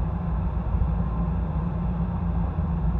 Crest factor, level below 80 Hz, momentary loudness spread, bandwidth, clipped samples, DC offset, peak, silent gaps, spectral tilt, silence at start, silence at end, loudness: 12 dB; -28 dBFS; 1 LU; 3.8 kHz; under 0.1%; under 0.1%; -12 dBFS; none; -11.5 dB/octave; 0 s; 0 s; -27 LUFS